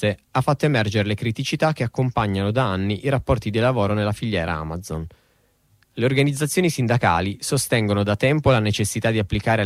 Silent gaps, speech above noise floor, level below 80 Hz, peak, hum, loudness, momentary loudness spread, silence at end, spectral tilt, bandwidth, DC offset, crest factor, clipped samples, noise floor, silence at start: none; 41 dB; -44 dBFS; -4 dBFS; none; -21 LUFS; 6 LU; 0 s; -5.5 dB/octave; 15.5 kHz; under 0.1%; 16 dB; under 0.1%; -62 dBFS; 0 s